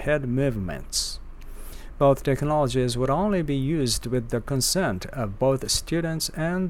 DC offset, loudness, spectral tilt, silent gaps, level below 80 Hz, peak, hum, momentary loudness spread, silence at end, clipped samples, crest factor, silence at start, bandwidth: under 0.1%; -25 LUFS; -4.5 dB/octave; none; -38 dBFS; -8 dBFS; none; 9 LU; 0 s; under 0.1%; 16 dB; 0 s; 17 kHz